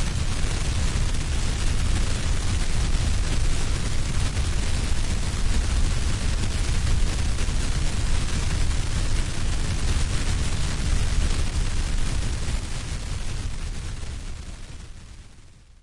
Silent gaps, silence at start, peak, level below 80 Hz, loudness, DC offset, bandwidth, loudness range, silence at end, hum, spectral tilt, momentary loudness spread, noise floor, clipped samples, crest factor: none; 0 s; -10 dBFS; -24 dBFS; -27 LUFS; under 0.1%; 11.5 kHz; 4 LU; 0.4 s; none; -4 dB/octave; 8 LU; -47 dBFS; under 0.1%; 12 dB